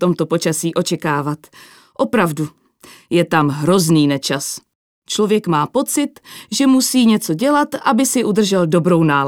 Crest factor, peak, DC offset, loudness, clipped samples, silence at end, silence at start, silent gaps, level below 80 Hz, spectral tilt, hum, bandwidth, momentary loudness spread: 16 dB; 0 dBFS; under 0.1%; -16 LUFS; under 0.1%; 0 s; 0 s; 4.75-5.02 s; -62 dBFS; -5 dB/octave; none; 20 kHz; 11 LU